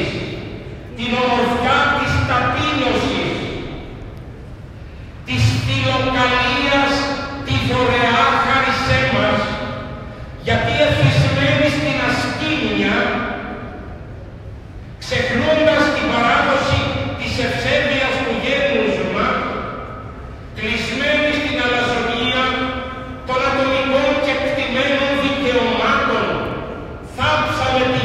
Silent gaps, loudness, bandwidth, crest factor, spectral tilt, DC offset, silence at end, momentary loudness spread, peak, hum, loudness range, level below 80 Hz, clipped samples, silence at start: none; -17 LUFS; 14 kHz; 16 dB; -5.5 dB/octave; under 0.1%; 0 s; 17 LU; -2 dBFS; none; 4 LU; -36 dBFS; under 0.1%; 0 s